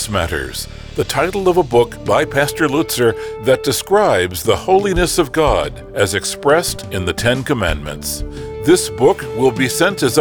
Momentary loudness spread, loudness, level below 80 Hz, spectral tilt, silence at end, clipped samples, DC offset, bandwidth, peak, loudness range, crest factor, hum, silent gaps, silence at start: 9 LU; -16 LUFS; -32 dBFS; -4 dB/octave; 0 s; under 0.1%; under 0.1%; over 20 kHz; -2 dBFS; 2 LU; 14 dB; none; none; 0 s